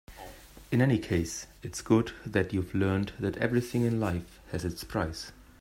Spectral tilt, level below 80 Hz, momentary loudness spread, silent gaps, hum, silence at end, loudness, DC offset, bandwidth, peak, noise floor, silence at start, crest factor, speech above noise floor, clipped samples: -6 dB/octave; -52 dBFS; 13 LU; none; none; 0.2 s; -30 LUFS; under 0.1%; 16 kHz; -10 dBFS; -49 dBFS; 0.1 s; 20 dB; 19 dB; under 0.1%